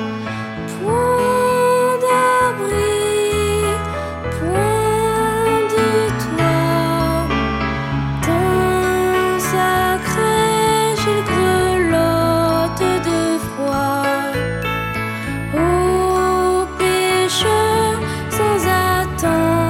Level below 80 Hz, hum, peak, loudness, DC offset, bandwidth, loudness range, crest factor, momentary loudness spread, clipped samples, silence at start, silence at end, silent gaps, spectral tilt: -34 dBFS; none; -4 dBFS; -17 LUFS; under 0.1%; 17 kHz; 2 LU; 14 dB; 6 LU; under 0.1%; 0 s; 0 s; none; -5 dB/octave